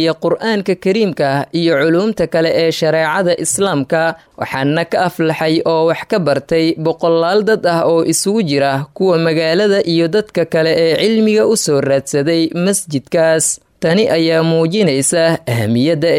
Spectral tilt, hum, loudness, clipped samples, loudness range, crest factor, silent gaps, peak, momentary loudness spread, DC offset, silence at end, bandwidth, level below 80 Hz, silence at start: -4.5 dB/octave; none; -14 LUFS; under 0.1%; 2 LU; 10 dB; none; -4 dBFS; 4 LU; under 0.1%; 0 s; 16 kHz; -54 dBFS; 0 s